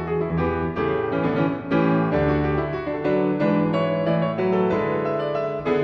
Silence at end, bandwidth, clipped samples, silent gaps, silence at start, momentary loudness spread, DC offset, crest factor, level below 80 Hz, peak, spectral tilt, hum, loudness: 0 s; 6 kHz; under 0.1%; none; 0 s; 4 LU; under 0.1%; 14 dB; -42 dBFS; -8 dBFS; -9.5 dB/octave; none; -22 LUFS